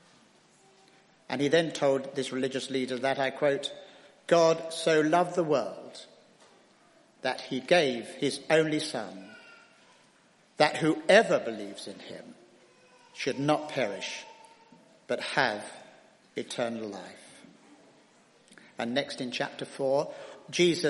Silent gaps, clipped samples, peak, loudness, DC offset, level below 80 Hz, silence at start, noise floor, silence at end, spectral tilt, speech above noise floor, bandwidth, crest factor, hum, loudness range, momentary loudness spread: none; under 0.1%; -4 dBFS; -28 LUFS; under 0.1%; -78 dBFS; 1.3 s; -63 dBFS; 0 s; -4.5 dB/octave; 34 dB; 11.5 kHz; 26 dB; none; 7 LU; 21 LU